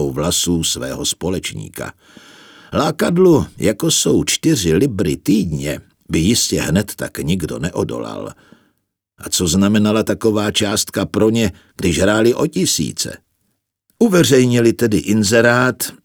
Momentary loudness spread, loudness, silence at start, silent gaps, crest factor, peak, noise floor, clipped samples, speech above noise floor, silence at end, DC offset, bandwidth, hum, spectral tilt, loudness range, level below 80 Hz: 11 LU; -16 LUFS; 0 s; none; 16 dB; 0 dBFS; -69 dBFS; under 0.1%; 53 dB; 0.1 s; under 0.1%; over 20 kHz; none; -4.5 dB/octave; 4 LU; -40 dBFS